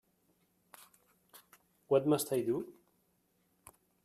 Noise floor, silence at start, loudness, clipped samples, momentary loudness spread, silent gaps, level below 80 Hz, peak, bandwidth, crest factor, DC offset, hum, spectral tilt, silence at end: -76 dBFS; 1.35 s; -33 LUFS; under 0.1%; 9 LU; none; -78 dBFS; -16 dBFS; 15.5 kHz; 22 dB; under 0.1%; none; -5.5 dB/octave; 1.35 s